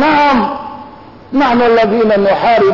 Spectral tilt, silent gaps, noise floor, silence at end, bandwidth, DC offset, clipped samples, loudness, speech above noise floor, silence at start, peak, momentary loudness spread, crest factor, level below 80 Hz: -6.5 dB/octave; none; -34 dBFS; 0 s; 6 kHz; under 0.1%; under 0.1%; -11 LUFS; 24 dB; 0 s; -2 dBFS; 14 LU; 8 dB; -42 dBFS